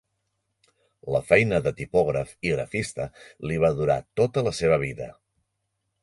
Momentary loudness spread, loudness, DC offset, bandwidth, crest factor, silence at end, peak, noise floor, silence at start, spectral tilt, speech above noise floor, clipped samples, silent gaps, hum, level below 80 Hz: 15 LU; -24 LUFS; under 0.1%; 11.5 kHz; 22 dB; 0.9 s; -4 dBFS; -78 dBFS; 1.05 s; -6 dB/octave; 54 dB; under 0.1%; none; none; -50 dBFS